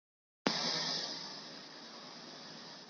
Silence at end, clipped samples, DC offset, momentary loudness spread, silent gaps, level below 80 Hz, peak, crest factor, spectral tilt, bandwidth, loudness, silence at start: 0 s; under 0.1%; under 0.1%; 15 LU; none; -84 dBFS; -12 dBFS; 30 dB; -2 dB/octave; 12 kHz; -38 LUFS; 0.45 s